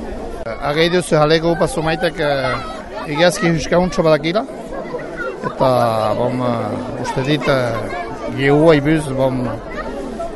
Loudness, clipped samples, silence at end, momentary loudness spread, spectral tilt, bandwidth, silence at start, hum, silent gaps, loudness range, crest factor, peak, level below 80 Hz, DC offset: -17 LUFS; under 0.1%; 0 s; 12 LU; -5.5 dB/octave; 12 kHz; 0 s; none; none; 2 LU; 16 dB; 0 dBFS; -36 dBFS; under 0.1%